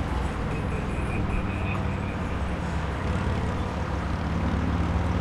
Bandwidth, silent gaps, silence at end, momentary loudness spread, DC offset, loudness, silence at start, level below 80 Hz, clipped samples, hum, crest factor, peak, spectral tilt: 11.5 kHz; none; 0 s; 3 LU; under 0.1%; -28 LUFS; 0 s; -32 dBFS; under 0.1%; none; 14 dB; -14 dBFS; -7 dB/octave